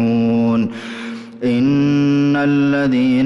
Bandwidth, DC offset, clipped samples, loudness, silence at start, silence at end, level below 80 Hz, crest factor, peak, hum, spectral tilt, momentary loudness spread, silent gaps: 7.2 kHz; under 0.1%; under 0.1%; -16 LUFS; 0 s; 0 s; -52 dBFS; 8 dB; -8 dBFS; none; -8 dB/octave; 13 LU; none